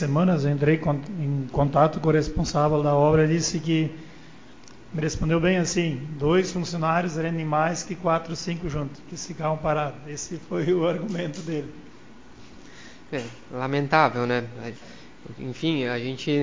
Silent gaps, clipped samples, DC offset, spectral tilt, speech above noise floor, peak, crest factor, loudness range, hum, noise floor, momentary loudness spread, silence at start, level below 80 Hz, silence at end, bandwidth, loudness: none; under 0.1%; 0.5%; -6 dB/octave; 24 dB; -4 dBFS; 20 dB; 7 LU; none; -48 dBFS; 15 LU; 0 s; -46 dBFS; 0 s; 7.6 kHz; -24 LUFS